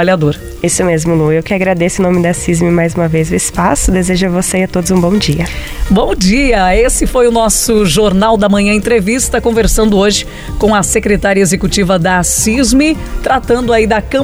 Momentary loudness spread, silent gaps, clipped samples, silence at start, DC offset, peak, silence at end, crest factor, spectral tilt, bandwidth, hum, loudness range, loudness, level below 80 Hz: 4 LU; none; under 0.1%; 0 s; under 0.1%; 0 dBFS; 0 s; 10 dB; -4.5 dB/octave; over 20 kHz; none; 2 LU; -11 LUFS; -22 dBFS